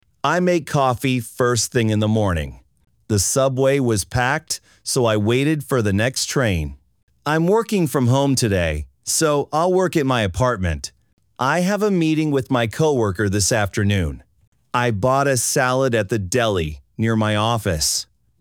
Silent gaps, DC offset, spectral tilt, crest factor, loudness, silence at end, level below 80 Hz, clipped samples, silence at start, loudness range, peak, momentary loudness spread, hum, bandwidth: 7.03-7.08 s, 11.13-11.17 s, 14.47-14.52 s; under 0.1%; -4.5 dB/octave; 16 dB; -19 LUFS; 0.4 s; -40 dBFS; under 0.1%; 0.25 s; 1 LU; -4 dBFS; 7 LU; none; over 20 kHz